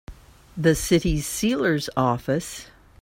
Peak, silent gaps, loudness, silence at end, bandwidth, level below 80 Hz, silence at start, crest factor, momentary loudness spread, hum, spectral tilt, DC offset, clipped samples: -6 dBFS; none; -23 LUFS; 0.35 s; 16.5 kHz; -40 dBFS; 0.1 s; 18 dB; 12 LU; none; -5 dB/octave; under 0.1%; under 0.1%